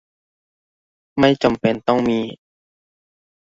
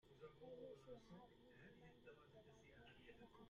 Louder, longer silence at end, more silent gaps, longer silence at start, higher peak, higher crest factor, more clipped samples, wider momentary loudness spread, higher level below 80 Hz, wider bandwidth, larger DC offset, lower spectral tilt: first, -18 LUFS vs -64 LUFS; first, 1.15 s vs 0 s; neither; first, 1.15 s vs 0.05 s; first, -2 dBFS vs -48 dBFS; about the same, 20 dB vs 16 dB; neither; first, 12 LU vs 8 LU; first, -52 dBFS vs -80 dBFS; about the same, 7.8 kHz vs 7.2 kHz; neither; first, -6.5 dB/octave vs -4.5 dB/octave